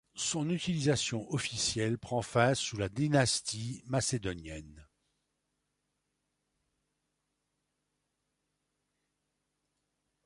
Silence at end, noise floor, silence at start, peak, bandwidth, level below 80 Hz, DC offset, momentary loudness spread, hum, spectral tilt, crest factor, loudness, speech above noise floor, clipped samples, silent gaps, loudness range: 5.4 s; -83 dBFS; 0.15 s; -14 dBFS; 11.5 kHz; -60 dBFS; under 0.1%; 10 LU; 50 Hz at -60 dBFS; -4 dB/octave; 22 dB; -32 LUFS; 51 dB; under 0.1%; none; 9 LU